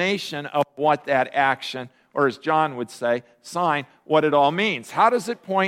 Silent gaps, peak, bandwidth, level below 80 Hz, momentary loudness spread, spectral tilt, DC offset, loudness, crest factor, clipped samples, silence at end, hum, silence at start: none; -4 dBFS; 16 kHz; -72 dBFS; 8 LU; -5 dB/octave; under 0.1%; -22 LUFS; 18 dB; under 0.1%; 0 s; none; 0 s